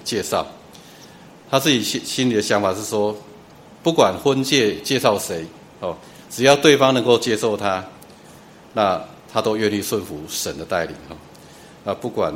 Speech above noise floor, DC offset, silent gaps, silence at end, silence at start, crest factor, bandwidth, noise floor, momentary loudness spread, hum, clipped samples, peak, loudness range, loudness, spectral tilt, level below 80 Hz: 25 dB; under 0.1%; none; 0 s; 0 s; 20 dB; 16.5 kHz; -44 dBFS; 15 LU; none; under 0.1%; 0 dBFS; 6 LU; -20 LUFS; -4 dB/octave; -56 dBFS